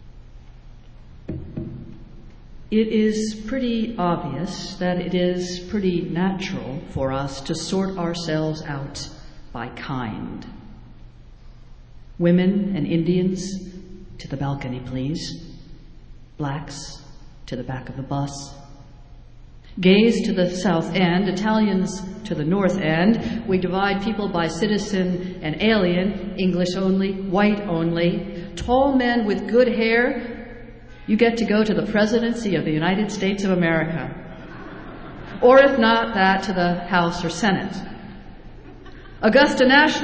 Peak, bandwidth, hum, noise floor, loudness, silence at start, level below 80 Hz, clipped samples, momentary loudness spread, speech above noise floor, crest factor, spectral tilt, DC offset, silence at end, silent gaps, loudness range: -4 dBFS; 8 kHz; none; -42 dBFS; -21 LUFS; 0 s; -44 dBFS; under 0.1%; 18 LU; 22 dB; 18 dB; -6 dB/octave; under 0.1%; 0 s; none; 12 LU